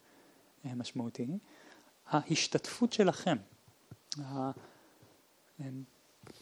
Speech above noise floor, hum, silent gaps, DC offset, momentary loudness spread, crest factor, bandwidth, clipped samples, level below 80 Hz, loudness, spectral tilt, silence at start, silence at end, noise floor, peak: 31 dB; none; none; under 0.1%; 19 LU; 22 dB; 19.5 kHz; under 0.1%; -82 dBFS; -35 LUFS; -4.5 dB/octave; 0.65 s; 0.05 s; -66 dBFS; -14 dBFS